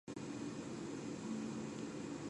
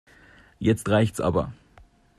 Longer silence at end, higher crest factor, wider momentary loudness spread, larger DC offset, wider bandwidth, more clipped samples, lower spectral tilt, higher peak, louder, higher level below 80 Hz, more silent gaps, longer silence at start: second, 0 s vs 0.65 s; second, 12 dB vs 18 dB; second, 2 LU vs 6 LU; neither; second, 11 kHz vs 14 kHz; neither; about the same, -5.5 dB/octave vs -6.5 dB/octave; second, -32 dBFS vs -8 dBFS; second, -46 LUFS vs -24 LUFS; second, -72 dBFS vs -50 dBFS; neither; second, 0.05 s vs 0.6 s